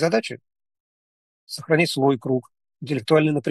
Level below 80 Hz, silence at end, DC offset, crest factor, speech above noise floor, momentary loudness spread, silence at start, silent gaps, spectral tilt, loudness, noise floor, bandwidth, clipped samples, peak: -72 dBFS; 0 s; under 0.1%; 20 dB; over 69 dB; 17 LU; 0 s; 0.80-1.47 s; -6 dB/octave; -21 LUFS; under -90 dBFS; 12.5 kHz; under 0.1%; -4 dBFS